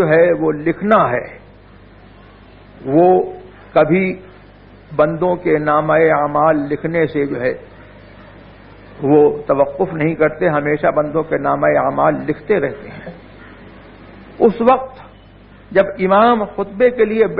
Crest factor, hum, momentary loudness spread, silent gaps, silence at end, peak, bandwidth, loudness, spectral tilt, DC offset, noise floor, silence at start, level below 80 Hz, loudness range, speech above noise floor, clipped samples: 16 dB; none; 11 LU; none; 0 s; 0 dBFS; 4.9 kHz; -15 LUFS; -10.5 dB/octave; under 0.1%; -42 dBFS; 0 s; -46 dBFS; 3 LU; 27 dB; under 0.1%